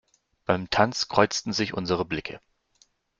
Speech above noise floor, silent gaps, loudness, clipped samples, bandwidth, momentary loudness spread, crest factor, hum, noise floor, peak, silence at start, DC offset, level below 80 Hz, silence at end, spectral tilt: 39 dB; none; -25 LUFS; under 0.1%; 9.4 kHz; 15 LU; 24 dB; none; -65 dBFS; -2 dBFS; 0.5 s; under 0.1%; -56 dBFS; 0.8 s; -4 dB/octave